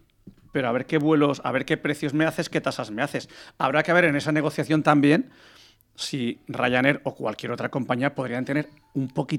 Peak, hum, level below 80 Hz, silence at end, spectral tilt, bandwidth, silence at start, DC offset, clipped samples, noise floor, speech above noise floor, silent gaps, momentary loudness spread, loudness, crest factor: -2 dBFS; none; -62 dBFS; 0 s; -6 dB/octave; 16 kHz; 0.25 s; under 0.1%; under 0.1%; -51 dBFS; 27 dB; none; 11 LU; -24 LUFS; 22 dB